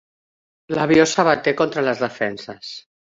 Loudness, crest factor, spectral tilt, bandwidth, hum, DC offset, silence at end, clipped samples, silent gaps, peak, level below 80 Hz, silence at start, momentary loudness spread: -19 LUFS; 20 dB; -4.5 dB/octave; 7.8 kHz; none; under 0.1%; 0.3 s; under 0.1%; none; -2 dBFS; -58 dBFS; 0.7 s; 17 LU